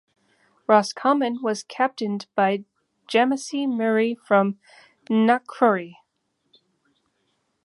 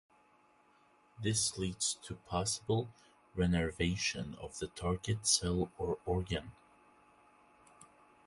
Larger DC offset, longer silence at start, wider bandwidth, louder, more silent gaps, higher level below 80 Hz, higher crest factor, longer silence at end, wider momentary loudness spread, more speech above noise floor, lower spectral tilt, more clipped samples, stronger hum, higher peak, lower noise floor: neither; second, 0.7 s vs 1.2 s; about the same, 11.5 kHz vs 11.5 kHz; first, -22 LUFS vs -35 LUFS; neither; second, -76 dBFS vs -52 dBFS; about the same, 22 dB vs 22 dB; first, 1.7 s vs 0.4 s; second, 8 LU vs 13 LU; first, 52 dB vs 32 dB; about the same, -5 dB/octave vs -4 dB/octave; neither; neither; first, -2 dBFS vs -16 dBFS; first, -74 dBFS vs -68 dBFS